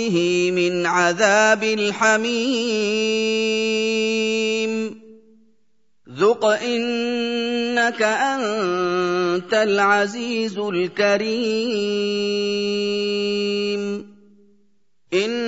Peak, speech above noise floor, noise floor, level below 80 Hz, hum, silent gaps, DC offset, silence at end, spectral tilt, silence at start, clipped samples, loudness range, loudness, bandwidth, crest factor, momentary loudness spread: -2 dBFS; 52 dB; -71 dBFS; -72 dBFS; none; none; 0.1%; 0 s; -3.5 dB/octave; 0 s; under 0.1%; 4 LU; -20 LUFS; 8 kHz; 18 dB; 6 LU